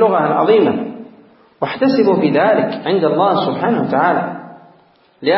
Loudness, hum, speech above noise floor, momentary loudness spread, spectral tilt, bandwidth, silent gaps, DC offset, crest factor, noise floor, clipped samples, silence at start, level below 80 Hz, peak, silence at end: -15 LUFS; none; 37 dB; 12 LU; -11 dB/octave; 5.8 kHz; none; under 0.1%; 14 dB; -51 dBFS; under 0.1%; 0 s; -64 dBFS; 0 dBFS; 0 s